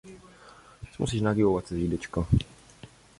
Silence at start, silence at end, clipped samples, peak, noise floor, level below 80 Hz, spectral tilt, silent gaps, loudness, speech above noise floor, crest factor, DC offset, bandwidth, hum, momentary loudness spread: 0.05 s; 0.35 s; under 0.1%; -10 dBFS; -52 dBFS; -42 dBFS; -7 dB/octave; none; -28 LUFS; 26 dB; 18 dB; under 0.1%; 11.5 kHz; none; 22 LU